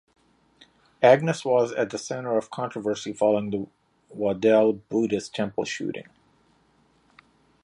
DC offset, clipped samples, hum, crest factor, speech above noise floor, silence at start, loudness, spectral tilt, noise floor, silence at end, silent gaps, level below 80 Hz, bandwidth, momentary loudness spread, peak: under 0.1%; under 0.1%; none; 22 dB; 39 dB; 1 s; -24 LUFS; -5.5 dB/octave; -63 dBFS; 1.6 s; none; -66 dBFS; 11 kHz; 13 LU; -4 dBFS